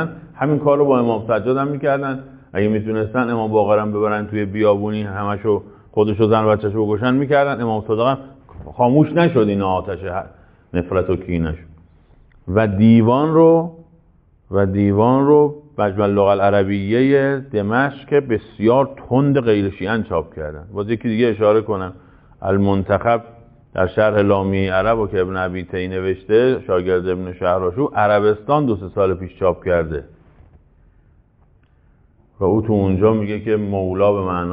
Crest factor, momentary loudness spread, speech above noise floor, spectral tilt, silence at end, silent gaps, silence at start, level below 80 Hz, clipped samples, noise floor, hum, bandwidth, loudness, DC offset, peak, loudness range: 16 dB; 9 LU; 37 dB; -6.5 dB/octave; 0 s; none; 0 s; -44 dBFS; under 0.1%; -54 dBFS; none; 5 kHz; -18 LUFS; under 0.1%; -2 dBFS; 5 LU